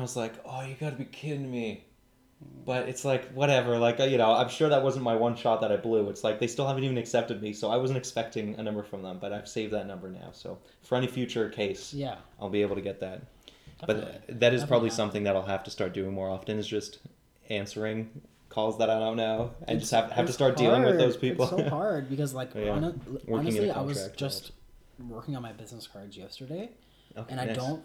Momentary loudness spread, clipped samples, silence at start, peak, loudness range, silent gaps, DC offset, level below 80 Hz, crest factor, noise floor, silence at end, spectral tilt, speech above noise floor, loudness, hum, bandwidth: 17 LU; under 0.1%; 0 s; -10 dBFS; 9 LU; none; under 0.1%; -58 dBFS; 20 dB; -63 dBFS; 0 s; -5.5 dB/octave; 34 dB; -29 LUFS; none; 16.5 kHz